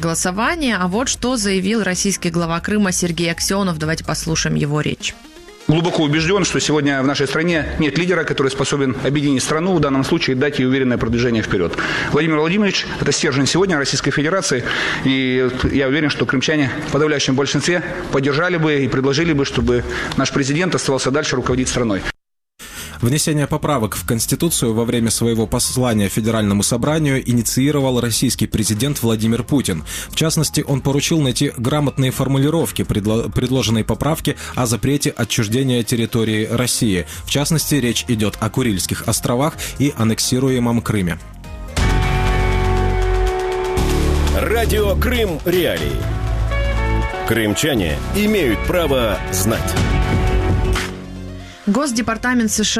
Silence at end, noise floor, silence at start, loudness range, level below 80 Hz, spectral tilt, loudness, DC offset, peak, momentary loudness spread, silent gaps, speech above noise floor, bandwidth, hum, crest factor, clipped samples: 0 s; -49 dBFS; 0 s; 2 LU; -28 dBFS; -4.5 dB/octave; -17 LUFS; under 0.1%; -2 dBFS; 4 LU; none; 32 dB; 15.5 kHz; none; 16 dB; under 0.1%